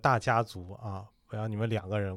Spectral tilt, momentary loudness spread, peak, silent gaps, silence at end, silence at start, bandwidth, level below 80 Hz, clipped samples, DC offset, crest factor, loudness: -6.5 dB/octave; 15 LU; -10 dBFS; none; 0 s; 0.05 s; 13 kHz; -60 dBFS; under 0.1%; under 0.1%; 20 dB; -32 LUFS